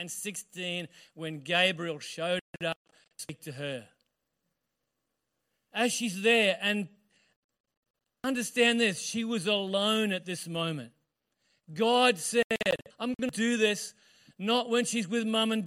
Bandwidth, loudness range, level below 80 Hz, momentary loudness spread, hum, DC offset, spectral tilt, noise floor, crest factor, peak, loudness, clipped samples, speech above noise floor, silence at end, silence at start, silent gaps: 16 kHz; 9 LU; -74 dBFS; 16 LU; none; under 0.1%; -3 dB/octave; -84 dBFS; 20 dB; -10 dBFS; -29 LUFS; under 0.1%; 54 dB; 0 s; 0 s; 2.41-2.53 s, 2.76-2.85 s, 7.36-7.49 s, 7.60-7.64 s, 7.77-7.83 s, 7.90-7.94 s, 12.44-12.50 s